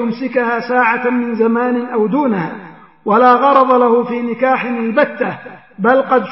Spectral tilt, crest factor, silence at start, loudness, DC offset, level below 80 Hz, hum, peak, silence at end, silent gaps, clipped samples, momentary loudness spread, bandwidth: -9.5 dB/octave; 14 dB; 0 s; -14 LUFS; 0.2%; -68 dBFS; none; 0 dBFS; 0 s; none; under 0.1%; 11 LU; 5.8 kHz